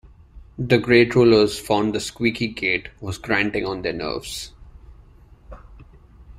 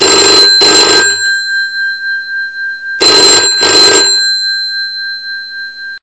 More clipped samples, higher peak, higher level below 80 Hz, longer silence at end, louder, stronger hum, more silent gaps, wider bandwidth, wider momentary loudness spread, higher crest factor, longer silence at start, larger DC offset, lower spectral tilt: second, under 0.1% vs 2%; about the same, -2 dBFS vs 0 dBFS; about the same, -46 dBFS vs -48 dBFS; about the same, 0.05 s vs 0.05 s; second, -20 LUFS vs -6 LUFS; neither; neither; first, 15.5 kHz vs 11 kHz; about the same, 17 LU vs 15 LU; first, 20 dB vs 10 dB; first, 0.35 s vs 0 s; second, under 0.1% vs 0.4%; first, -5.5 dB/octave vs 0.5 dB/octave